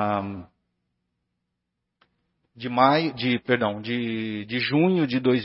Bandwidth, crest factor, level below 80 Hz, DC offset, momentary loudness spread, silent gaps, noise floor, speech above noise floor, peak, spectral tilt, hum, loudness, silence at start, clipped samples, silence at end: 5.8 kHz; 22 dB; -66 dBFS; under 0.1%; 10 LU; none; -81 dBFS; 57 dB; -4 dBFS; -10 dB/octave; 60 Hz at -55 dBFS; -23 LUFS; 0 s; under 0.1%; 0 s